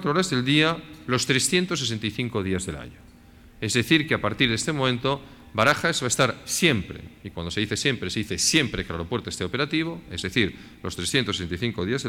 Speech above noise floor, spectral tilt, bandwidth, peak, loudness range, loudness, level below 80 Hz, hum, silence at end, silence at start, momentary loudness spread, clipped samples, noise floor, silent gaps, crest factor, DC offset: 25 dB; -3.5 dB/octave; 18 kHz; -4 dBFS; 3 LU; -24 LUFS; -50 dBFS; none; 0 s; 0 s; 12 LU; under 0.1%; -50 dBFS; none; 20 dB; under 0.1%